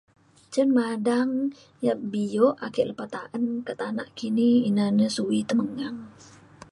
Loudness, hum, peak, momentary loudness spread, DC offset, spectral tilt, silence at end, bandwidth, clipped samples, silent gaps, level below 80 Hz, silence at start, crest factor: -25 LUFS; none; -8 dBFS; 10 LU; under 0.1%; -6 dB/octave; 0.05 s; 11.5 kHz; under 0.1%; none; -68 dBFS; 0.5 s; 18 dB